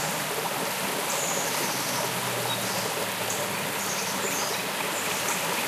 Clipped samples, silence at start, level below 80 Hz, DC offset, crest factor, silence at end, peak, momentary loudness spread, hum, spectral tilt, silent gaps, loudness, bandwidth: under 0.1%; 0 s; -70 dBFS; under 0.1%; 16 dB; 0 s; -14 dBFS; 2 LU; none; -1.5 dB/octave; none; -27 LUFS; 15.5 kHz